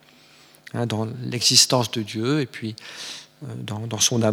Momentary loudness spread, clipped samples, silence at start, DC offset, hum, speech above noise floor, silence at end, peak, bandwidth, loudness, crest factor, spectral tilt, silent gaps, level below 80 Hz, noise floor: 20 LU; under 0.1%; 0.75 s; under 0.1%; none; 29 dB; 0 s; -2 dBFS; over 20 kHz; -21 LUFS; 22 dB; -3 dB/octave; none; -70 dBFS; -52 dBFS